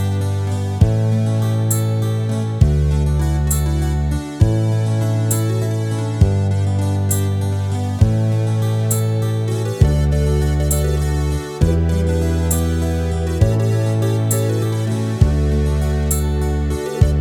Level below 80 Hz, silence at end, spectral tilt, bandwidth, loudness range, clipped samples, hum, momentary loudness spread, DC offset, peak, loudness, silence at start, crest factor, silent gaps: -24 dBFS; 0 s; -6.5 dB/octave; 18.5 kHz; 1 LU; under 0.1%; none; 4 LU; under 0.1%; 0 dBFS; -18 LUFS; 0 s; 16 dB; none